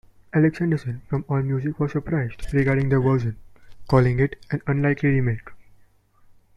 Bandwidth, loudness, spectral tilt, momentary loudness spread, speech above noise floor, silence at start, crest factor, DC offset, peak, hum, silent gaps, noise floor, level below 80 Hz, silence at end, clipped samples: 6.8 kHz; -23 LUFS; -9.5 dB/octave; 8 LU; 35 dB; 0.35 s; 18 dB; under 0.1%; -4 dBFS; none; none; -56 dBFS; -42 dBFS; 0.95 s; under 0.1%